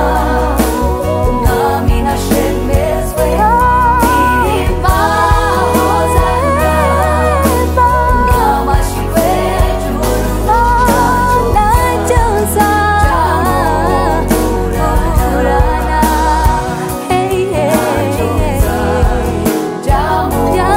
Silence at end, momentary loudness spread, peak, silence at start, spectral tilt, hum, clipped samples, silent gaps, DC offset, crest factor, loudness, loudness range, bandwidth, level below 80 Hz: 0 s; 4 LU; 0 dBFS; 0 s; -5.5 dB/octave; none; under 0.1%; none; under 0.1%; 10 dB; -12 LUFS; 2 LU; 16.5 kHz; -18 dBFS